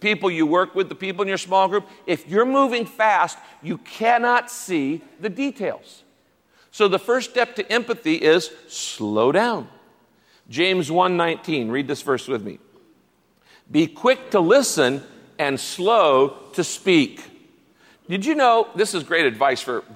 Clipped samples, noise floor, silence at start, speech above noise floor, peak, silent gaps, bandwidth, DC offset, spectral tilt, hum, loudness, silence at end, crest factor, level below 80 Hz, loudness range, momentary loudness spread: under 0.1%; -61 dBFS; 0 s; 41 dB; -4 dBFS; none; 16 kHz; under 0.1%; -4 dB/octave; none; -20 LUFS; 0 s; 16 dB; -72 dBFS; 5 LU; 12 LU